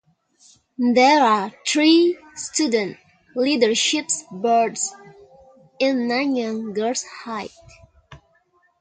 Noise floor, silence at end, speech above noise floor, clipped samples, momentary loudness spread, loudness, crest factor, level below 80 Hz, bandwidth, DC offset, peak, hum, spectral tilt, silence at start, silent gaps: -62 dBFS; 0.65 s; 42 dB; under 0.1%; 16 LU; -20 LUFS; 18 dB; -64 dBFS; 9.6 kHz; under 0.1%; -4 dBFS; none; -2.5 dB/octave; 0.8 s; none